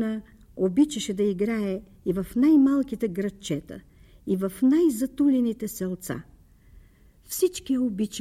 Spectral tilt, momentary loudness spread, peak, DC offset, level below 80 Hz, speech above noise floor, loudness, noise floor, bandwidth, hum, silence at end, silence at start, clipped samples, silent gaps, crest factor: -6 dB/octave; 14 LU; -12 dBFS; under 0.1%; -54 dBFS; 30 dB; -25 LUFS; -54 dBFS; 16 kHz; none; 0 s; 0 s; under 0.1%; none; 14 dB